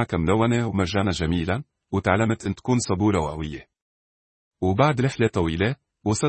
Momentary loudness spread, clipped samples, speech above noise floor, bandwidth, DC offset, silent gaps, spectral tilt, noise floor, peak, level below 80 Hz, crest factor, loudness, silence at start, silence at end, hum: 9 LU; under 0.1%; over 68 dB; 8.8 kHz; under 0.1%; 3.82-4.51 s; -6 dB/octave; under -90 dBFS; -4 dBFS; -46 dBFS; 18 dB; -23 LUFS; 0 s; 0 s; none